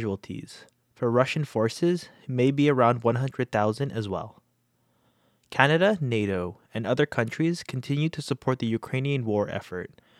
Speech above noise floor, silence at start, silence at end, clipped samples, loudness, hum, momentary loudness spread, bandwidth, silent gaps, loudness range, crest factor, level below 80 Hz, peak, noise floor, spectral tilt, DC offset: 44 dB; 0 s; 0.35 s; under 0.1%; -26 LUFS; none; 12 LU; 13 kHz; none; 3 LU; 24 dB; -66 dBFS; -2 dBFS; -70 dBFS; -6.5 dB/octave; under 0.1%